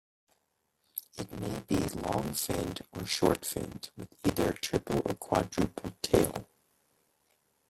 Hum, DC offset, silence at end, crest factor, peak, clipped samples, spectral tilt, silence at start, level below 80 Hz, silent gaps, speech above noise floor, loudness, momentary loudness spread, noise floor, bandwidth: none; under 0.1%; 1.25 s; 26 dB; -8 dBFS; under 0.1%; -4.5 dB/octave; 0.95 s; -52 dBFS; none; 46 dB; -32 LUFS; 14 LU; -78 dBFS; 16.5 kHz